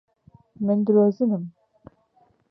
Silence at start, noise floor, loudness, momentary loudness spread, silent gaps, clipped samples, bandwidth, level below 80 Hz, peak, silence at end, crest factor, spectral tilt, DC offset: 0.6 s; -63 dBFS; -22 LUFS; 11 LU; none; under 0.1%; 5.2 kHz; -68 dBFS; -8 dBFS; 1 s; 16 dB; -12 dB/octave; under 0.1%